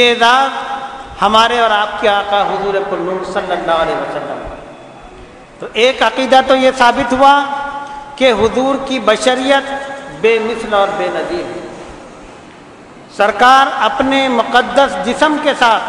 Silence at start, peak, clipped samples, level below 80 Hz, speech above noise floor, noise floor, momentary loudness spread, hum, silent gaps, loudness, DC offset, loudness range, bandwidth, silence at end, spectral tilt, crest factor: 0 s; 0 dBFS; 0.5%; -44 dBFS; 24 dB; -36 dBFS; 16 LU; none; none; -12 LUFS; under 0.1%; 6 LU; 12 kHz; 0 s; -3.5 dB/octave; 14 dB